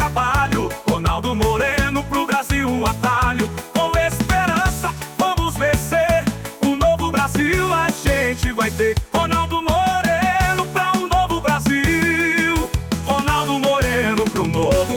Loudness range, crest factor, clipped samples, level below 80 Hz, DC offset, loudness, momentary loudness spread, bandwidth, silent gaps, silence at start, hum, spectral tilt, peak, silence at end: 1 LU; 12 dB; under 0.1%; -30 dBFS; under 0.1%; -18 LUFS; 4 LU; 19.5 kHz; none; 0 s; none; -5 dB/octave; -6 dBFS; 0 s